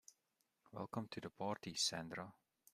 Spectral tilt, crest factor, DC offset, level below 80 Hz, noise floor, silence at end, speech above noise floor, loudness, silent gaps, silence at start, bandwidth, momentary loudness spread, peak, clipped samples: -3 dB/octave; 22 dB; under 0.1%; -82 dBFS; -86 dBFS; 0.4 s; 40 dB; -44 LUFS; none; 0.1 s; 15 kHz; 14 LU; -26 dBFS; under 0.1%